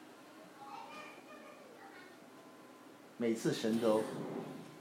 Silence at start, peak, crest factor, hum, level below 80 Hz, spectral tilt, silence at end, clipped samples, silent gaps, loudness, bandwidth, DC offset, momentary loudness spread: 0 s; -20 dBFS; 22 dB; none; under -90 dBFS; -5.5 dB/octave; 0 s; under 0.1%; none; -38 LUFS; 16 kHz; under 0.1%; 23 LU